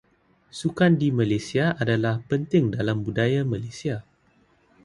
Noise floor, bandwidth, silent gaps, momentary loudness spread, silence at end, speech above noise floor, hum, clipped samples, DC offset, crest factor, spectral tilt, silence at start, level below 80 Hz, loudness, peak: -62 dBFS; 11 kHz; none; 10 LU; 0.85 s; 39 dB; none; under 0.1%; under 0.1%; 18 dB; -7 dB/octave; 0.55 s; -54 dBFS; -24 LUFS; -8 dBFS